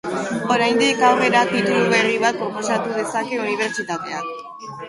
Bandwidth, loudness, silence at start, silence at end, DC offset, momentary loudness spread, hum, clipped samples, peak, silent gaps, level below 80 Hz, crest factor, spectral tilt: 11.5 kHz; -19 LUFS; 0.05 s; 0 s; under 0.1%; 11 LU; none; under 0.1%; -2 dBFS; none; -64 dBFS; 16 dB; -4 dB/octave